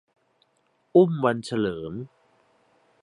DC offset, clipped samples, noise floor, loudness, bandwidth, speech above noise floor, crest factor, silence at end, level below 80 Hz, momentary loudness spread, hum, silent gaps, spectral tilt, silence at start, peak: under 0.1%; under 0.1%; -69 dBFS; -24 LUFS; 11 kHz; 46 dB; 20 dB; 0.95 s; -62 dBFS; 18 LU; none; none; -7.5 dB/octave; 0.95 s; -6 dBFS